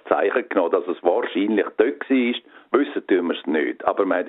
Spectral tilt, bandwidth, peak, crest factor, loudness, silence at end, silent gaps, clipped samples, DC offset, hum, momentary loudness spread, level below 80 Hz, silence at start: -8.5 dB/octave; 4.1 kHz; -2 dBFS; 18 dB; -22 LUFS; 0 s; none; under 0.1%; under 0.1%; none; 3 LU; -70 dBFS; 0.05 s